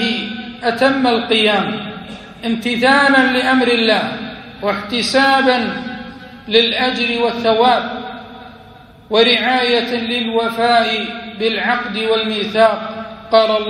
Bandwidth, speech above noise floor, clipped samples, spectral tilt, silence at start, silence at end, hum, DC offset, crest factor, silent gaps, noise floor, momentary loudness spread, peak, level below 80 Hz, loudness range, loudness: 14.5 kHz; 26 dB; under 0.1%; -4 dB/octave; 0 s; 0 s; none; under 0.1%; 16 dB; none; -41 dBFS; 16 LU; 0 dBFS; -52 dBFS; 2 LU; -15 LUFS